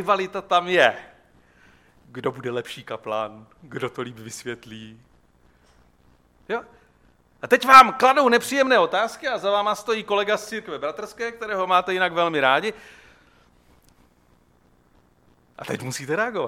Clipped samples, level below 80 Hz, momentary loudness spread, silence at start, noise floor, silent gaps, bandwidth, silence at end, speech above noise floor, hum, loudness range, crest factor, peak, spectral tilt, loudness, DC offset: under 0.1%; -62 dBFS; 17 LU; 0 s; -59 dBFS; none; 16.5 kHz; 0 s; 38 dB; none; 19 LU; 22 dB; 0 dBFS; -3.5 dB/octave; -21 LUFS; under 0.1%